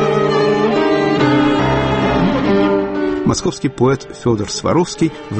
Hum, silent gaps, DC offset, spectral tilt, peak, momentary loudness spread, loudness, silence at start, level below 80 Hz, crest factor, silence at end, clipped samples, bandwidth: none; none; under 0.1%; -6 dB/octave; -2 dBFS; 5 LU; -15 LUFS; 0 s; -36 dBFS; 12 dB; 0 s; under 0.1%; 8.8 kHz